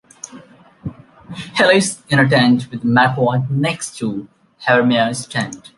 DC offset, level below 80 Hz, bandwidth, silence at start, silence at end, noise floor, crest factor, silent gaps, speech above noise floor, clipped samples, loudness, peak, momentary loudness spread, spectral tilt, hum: under 0.1%; -54 dBFS; 11.5 kHz; 0.25 s; 0.2 s; -43 dBFS; 16 dB; none; 27 dB; under 0.1%; -16 LUFS; -2 dBFS; 20 LU; -5 dB/octave; none